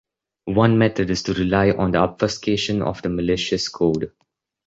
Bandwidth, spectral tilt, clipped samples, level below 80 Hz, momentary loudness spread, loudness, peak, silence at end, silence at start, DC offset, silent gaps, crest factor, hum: 8 kHz; -6 dB/octave; under 0.1%; -42 dBFS; 7 LU; -20 LUFS; -2 dBFS; 0.6 s; 0.45 s; under 0.1%; none; 18 dB; none